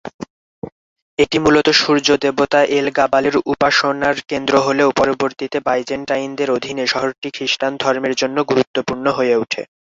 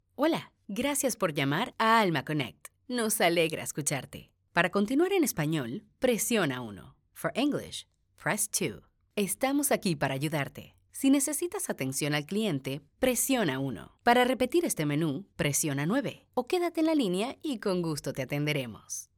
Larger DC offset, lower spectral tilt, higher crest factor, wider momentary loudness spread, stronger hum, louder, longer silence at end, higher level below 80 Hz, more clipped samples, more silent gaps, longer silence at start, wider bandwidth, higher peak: neither; about the same, -4 dB/octave vs -4 dB/octave; second, 16 dB vs 22 dB; about the same, 10 LU vs 11 LU; neither; first, -16 LUFS vs -29 LUFS; about the same, 0.25 s vs 0.15 s; first, -52 dBFS vs -62 dBFS; neither; first, 0.14-0.19 s, 0.30-0.62 s, 0.72-0.96 s, 1.02-1.17 s, 7.18-7.22 s, 8.67-8.74 s vs none; second, 0.05 s vs 0.2 s; second, 7.8 kHz vs 19 kHz; first, 0 dBFS vs -8 dBFS